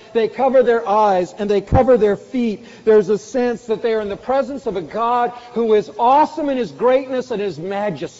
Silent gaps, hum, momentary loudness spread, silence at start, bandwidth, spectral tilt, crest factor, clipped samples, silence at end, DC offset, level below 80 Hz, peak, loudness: none; none; 9 LU; 0.15 s; 8 kHz; -5.5 dB/octave; 14 dB; under 0.1%; 0.1 s; under 0.1%; -40 dBFS; -2 dBFS; -18 LUFS